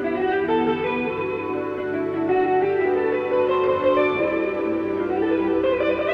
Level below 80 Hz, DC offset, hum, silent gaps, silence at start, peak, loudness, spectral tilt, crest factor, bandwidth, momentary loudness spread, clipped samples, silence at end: -54 dBFS; under 0.1%; none; none; 0 s; -8 dBFS; -22 LUFS; -8 dB/octave; 12 dB; 5.4 kHz; 6 LU; under 0.1%; 0 s